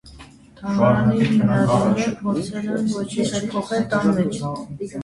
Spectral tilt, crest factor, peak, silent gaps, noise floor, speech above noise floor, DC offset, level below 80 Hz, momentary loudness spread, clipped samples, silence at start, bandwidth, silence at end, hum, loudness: -6.5 dB/octave; 16 dB; -4 dBFS; none; -44 dBFS; 24 dB; under 0.1%; -48 dBFS; 10 LU; under 0.1%; 0.05 s; 11.5 kHz; 0 s; none; -20 LUFS